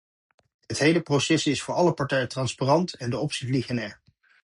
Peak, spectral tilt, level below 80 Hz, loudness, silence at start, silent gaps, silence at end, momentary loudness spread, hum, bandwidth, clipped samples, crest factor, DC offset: -8 dBFS; -5 dB/octave; -60 dBFS; -25 LUFS; 0.7 s; none; 0.5 s; 8 LU; none; 11.5 kHz; under 0.1%; 18 dB; under 0.1%